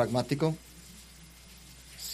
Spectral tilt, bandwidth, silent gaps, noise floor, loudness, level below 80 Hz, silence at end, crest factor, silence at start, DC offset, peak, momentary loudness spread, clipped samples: -5.5 dB/octave; 15.5 kHz; none; -52 dBFS; -31 LUFS; -56 dBFS; 0 s; 22 dB; 0 s; under 0.1%; -12 dBFS; 22 LU; under 0.1%